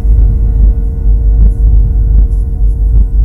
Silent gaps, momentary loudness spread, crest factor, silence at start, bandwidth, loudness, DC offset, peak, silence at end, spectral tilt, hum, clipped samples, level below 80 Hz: none; 4 LU; 6 dB; 0 s; 1.1 kHz; -11 LUFS; under 0.1%; 0 dBFS; 0 s; -11.5 dB/octave; none; 1%; -6 dBFS